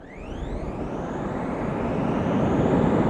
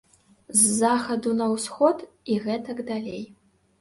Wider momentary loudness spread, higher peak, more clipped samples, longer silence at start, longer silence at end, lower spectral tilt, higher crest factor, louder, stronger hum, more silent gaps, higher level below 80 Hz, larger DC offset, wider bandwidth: about the same, 12 LU vs 14 LU; about the same, -8 dBFS vs -6 dBFS; neither; second, 0 s vs 0.5 s; second, 0 s vs 0.55 s; first, -8.5 dB/octave vs -3.5 dB/octave; about the same, 16 dB vs 20 dB; about the same, -26 LUFS vs -24 LUFS; neither; neither; first, -38 dBFS vs -66 dBFS; neither; second, 9.8 kHz vs 12 kHz